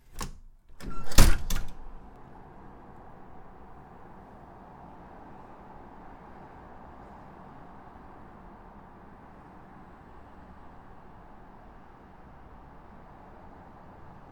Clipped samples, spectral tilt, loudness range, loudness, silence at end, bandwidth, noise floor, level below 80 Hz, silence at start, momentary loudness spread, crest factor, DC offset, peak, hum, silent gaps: under 0.1%; -4 dB/octave; 19 LU; -32 LUFS; 10.9 s; 18.5 kHz; -50 dBFS; -34 dBFS; 0.15 s; 14 LU; 28 dB; under 0.1%; -2 dBFS; none; none